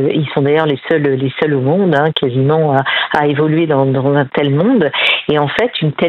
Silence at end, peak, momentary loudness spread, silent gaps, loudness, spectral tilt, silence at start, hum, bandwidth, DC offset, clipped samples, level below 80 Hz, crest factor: 0 s; 0 dBFS; 3 LU; none; -13 LUFS; -8 dB/octave; 0 s; none; 6.6 kHz; under 0.1%; under 0.1%; -54 dBFS; 12 dB